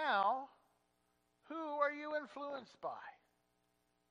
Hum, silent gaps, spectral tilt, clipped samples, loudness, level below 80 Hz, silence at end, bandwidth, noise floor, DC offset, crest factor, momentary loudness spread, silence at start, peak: 60 Hz at -85 dBFS; none; -4.5 dB/octave; under 0.1%; -41 LUFS; under -90 dBFS; 0.95 s; 9.4 kHz; -81 dBFS; under 0.1%; 20 dB; 16 LU; 0 s; -22 dBFS